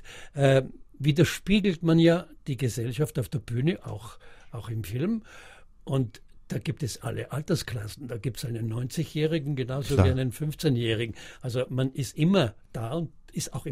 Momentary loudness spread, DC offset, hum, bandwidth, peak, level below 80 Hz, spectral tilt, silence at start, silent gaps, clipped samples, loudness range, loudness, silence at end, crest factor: 13 LU; under 0.1%; none; 16 kHz; -6 dBFS; -48 dBFS; -6.5 dB/octave; 0 s; none; under 0.1%; 7 LU; -28 LUFS; 0 s; 22 dB